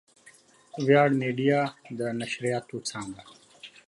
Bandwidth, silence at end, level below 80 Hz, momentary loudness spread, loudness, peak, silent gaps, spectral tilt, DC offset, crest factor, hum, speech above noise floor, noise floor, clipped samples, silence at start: 11.5 kHz; 0.2 s; -70 dBFS; 23 LU; -26 LUFS; -8 dBFS; none; -5.5 dB/octave; under 0.1%; 20 dB; none; 30 dB; -57 dBFS; under 0.1%; 0.25 s